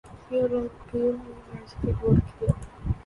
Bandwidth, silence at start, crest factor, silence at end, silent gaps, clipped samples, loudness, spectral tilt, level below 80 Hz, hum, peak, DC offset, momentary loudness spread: 11.5 kHz; 0.05 s; 18 dB; 0.05 s; none; under 0.1%; -27 LUFS; -9.5 dB/octave; -38 dBFS; none; -8 dBFS; under 0.1%; 15 LU